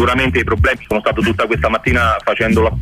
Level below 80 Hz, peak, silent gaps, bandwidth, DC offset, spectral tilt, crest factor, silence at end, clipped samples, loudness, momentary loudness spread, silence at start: -26 dBFS; -2 dBFS; none; 15.5 kHz; under 0.1%; -6 dB/octave; 12 dB; 0 s; under 0.1%; -15 LUFS; 2 LU; 0 s